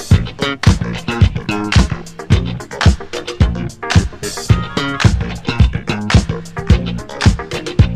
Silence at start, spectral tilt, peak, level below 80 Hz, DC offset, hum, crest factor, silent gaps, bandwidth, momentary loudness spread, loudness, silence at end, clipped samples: 0 s; -5.5 dB/octave; 0 dBFS; -20 dBFS; under 0.1%; none; 14 dB; none; 13 kHz; 9 LU; -16 LUFS; 0 s; 0.1%